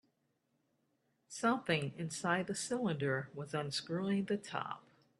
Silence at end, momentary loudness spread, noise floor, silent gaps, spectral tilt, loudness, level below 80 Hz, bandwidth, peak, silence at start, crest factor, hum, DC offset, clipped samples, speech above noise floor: 0.4 s; 7 LU; -80 dBFS; none; -4.5 dB/octave; -37 LUFS; -78 dBFS; 12.5 kHz; -18 dBFS; 1.3 s; 22 dB; none; under 0.1%; under 0.1%; 44 dB